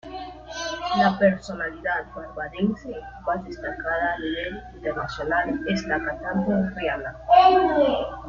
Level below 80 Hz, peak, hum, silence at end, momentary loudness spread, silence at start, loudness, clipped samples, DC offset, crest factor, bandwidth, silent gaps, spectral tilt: -46 dBFS; -4 dBFS; none; 0 s; 15 LU; 0.05 s; -24 LUFS; under 0.1%; under 0.1%; 20 dB; 7.4 kHz; none; -6 dB/octave